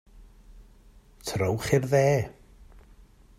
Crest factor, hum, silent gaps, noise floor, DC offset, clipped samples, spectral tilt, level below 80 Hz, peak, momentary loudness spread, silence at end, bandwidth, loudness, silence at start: 22 dB; none; none; -54 dBFS; under 0.1%; under 0.1%; -6 dB/octave; -52 dBFS; -8 dBFS; 15 LU; 1.05 s; 15.5 kHz; -26 LUFS; 0.15 s